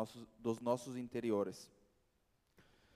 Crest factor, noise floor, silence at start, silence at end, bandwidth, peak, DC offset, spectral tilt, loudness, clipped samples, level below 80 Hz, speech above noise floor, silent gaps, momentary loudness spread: 20 dB; -79 dBFS; 0 s; 0.35 s; 15.5 kHz; -22 dBFS; under 0.1%; -6 dB/octave; -41 LUFS; under 0.1%; -78 dBFS; 38 dB; none; 12 LU